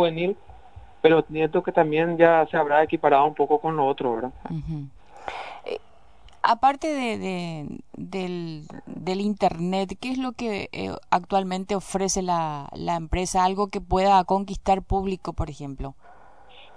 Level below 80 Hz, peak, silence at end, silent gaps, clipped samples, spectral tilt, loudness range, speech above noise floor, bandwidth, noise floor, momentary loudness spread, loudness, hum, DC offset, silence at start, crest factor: -42 dBFS; -2 dBFS; 0.15 s; none; under 0.1%; -5 dB/octave; 7 LU; 30 dB; 11 kHz; -53 dBFS; 16 LU; -24 LUFS; none; 0.4%; 0 s; 22 dB